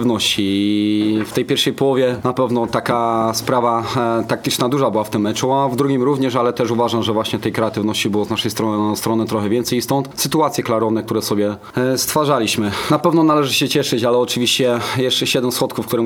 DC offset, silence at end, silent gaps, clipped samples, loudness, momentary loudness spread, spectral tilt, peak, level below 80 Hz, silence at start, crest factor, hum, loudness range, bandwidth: under 0.1%; 0 s; none; under 0.1%; -17 LUFS; 4 LU; -4.5 dB/octave; 0 dBFS; -54 dBFS; 0 s; 16 dB; none; 3 LU; over 20 kHz